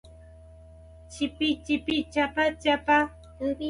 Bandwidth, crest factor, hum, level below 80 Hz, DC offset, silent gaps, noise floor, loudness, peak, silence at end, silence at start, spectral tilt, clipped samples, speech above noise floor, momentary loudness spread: 11 kHz; 18 dB; none; -50 dBFS; under 0.1%; none; -49 dBFS; -26 LUFS; -10 dBFS; 0 s; 0.05 s; -4.5 dB/octave; under 0.1%; 23 dB; 10 LU